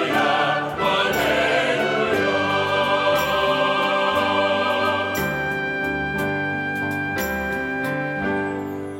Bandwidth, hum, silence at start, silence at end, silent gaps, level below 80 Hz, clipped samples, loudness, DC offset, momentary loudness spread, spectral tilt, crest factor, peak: 16.5 kHz; none; 0 s; 0 s; none; -48 dBFS; under 0.1%; -21 LUFS; under 0.1%; 5 LU; -4.5 dB/octave; 14 dB; -6 dBFS